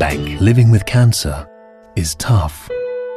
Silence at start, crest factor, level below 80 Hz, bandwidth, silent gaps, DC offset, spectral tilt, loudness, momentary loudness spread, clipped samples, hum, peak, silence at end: 0 s; 14 dB; -32 dBFS; 14 kHz; none; under 0.1%; -6 dB/octave; -15 LUFS; 12 LU; under 0.1%; none; -2 dBFS; 0 s